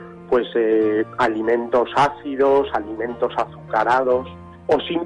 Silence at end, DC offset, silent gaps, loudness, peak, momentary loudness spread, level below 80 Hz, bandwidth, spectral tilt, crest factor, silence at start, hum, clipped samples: 0 s; under 0.1%; none; -20 LUFS; -8 dBFS; 7 LU; -52 dBFS; 10.5 kHz; -6 dB/octave; 12 dB; 0 s; none; under 0.1%